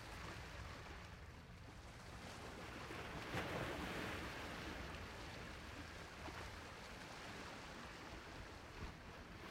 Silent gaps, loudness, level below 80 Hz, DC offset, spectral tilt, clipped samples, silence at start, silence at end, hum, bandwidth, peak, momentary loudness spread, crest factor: none; -51 LUFS; -60 dBFS; under 0.1%; -4.5 dB/octave; under 0.1%; 0 s; 0 s; none; 16 kHz; -30 dBFS; 10 LU; 20 dB